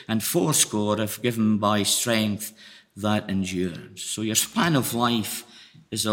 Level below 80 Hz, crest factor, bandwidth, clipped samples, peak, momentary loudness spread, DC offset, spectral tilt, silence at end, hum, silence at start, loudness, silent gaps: -66 dBFS; 20 dB; 17 kHz; under 0.1%; -4 dBFS; 11 LU; under 0.1%; -3.5 dB/octave; 0 s; none; 0 s; -24 LUFS; none